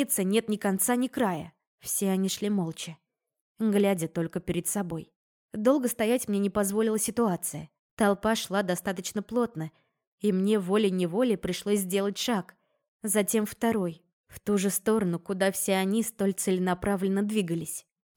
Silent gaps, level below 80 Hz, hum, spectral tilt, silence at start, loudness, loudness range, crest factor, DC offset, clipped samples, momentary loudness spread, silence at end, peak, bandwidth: 1.67-1.78 s, 3.41-3.55 s, 5.16-5.49 s, 7.79-7.97 s, 10.07-10.18 s, 12.88-12.99 s, 14.13-14.24 s; -60 dBFS; none; -4.5 dB/octave; 0 s; -28 LUFS; 2 LU; 16 dB; under 0.1%; under 0.1%; 10 LU; 0.35 s; -12 dBFS; 19.5 kHz